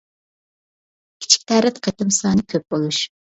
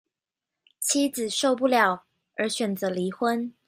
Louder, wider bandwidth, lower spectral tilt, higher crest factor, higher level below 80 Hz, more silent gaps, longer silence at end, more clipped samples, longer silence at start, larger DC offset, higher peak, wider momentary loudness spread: first, -18 LUFS vs -25 LUFS; second, 8.2 kHz vs 16 kHz; about the same, -3.5 dB/octave vs -3 dB/octave; about the same, 20 dB vs 20 dB; first, -54 dBFS vs -76 dBFS; neither; first, 0.3 s vs 0.15 s; neither; first, 1.2 s vs 0.8 s; neither; first, 0 dBFS vs -6 dBFS; about the same, 8 LU vs 9 LU